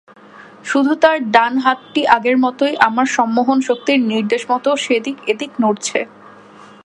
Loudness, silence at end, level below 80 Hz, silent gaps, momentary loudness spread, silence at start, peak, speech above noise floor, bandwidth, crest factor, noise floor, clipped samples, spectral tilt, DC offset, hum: -16 LUFS; 0.75 s; -64 dBFS; none; 8 LU; 0.35 s; 0 dBFS; 26 dB; 11 kHz; 16 dB; -41 dBFS; under 0.1%; -3.5 dB/octave; under 0.1%; none